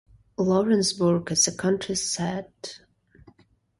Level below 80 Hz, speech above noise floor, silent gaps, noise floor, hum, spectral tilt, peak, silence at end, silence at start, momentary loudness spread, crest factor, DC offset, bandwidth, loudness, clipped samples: -60 dBFS; 36 dB; none; -60 dBFS; none; -4 dB/octave; -8 dBFS; 1 s; 0.4 s; 18 LU; 18 dB; under 0.1%; 11.5 kHz; -24 LUFS; under 0.1%